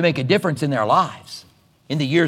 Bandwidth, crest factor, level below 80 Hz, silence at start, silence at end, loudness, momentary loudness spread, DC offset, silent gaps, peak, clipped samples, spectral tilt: 15 kHz; 18 dB; -66 dBFS; 0 s; 0 s; -20 LUFS; 19 LU; under 0.1%; none; -2 dBFS; under 0.1%; -6 dB/octave